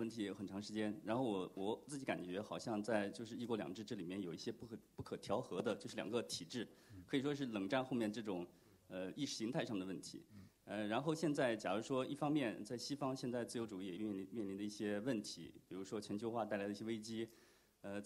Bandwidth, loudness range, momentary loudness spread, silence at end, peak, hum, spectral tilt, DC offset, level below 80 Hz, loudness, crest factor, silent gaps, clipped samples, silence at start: 16 kHz; 4 LU; 11 LU; 0 s; -24 dBFS; none; -5 dB/octave; under 0.1%; -80 dBFS; -44 LUFS; 20 dB; none; under 0.1%; 0 s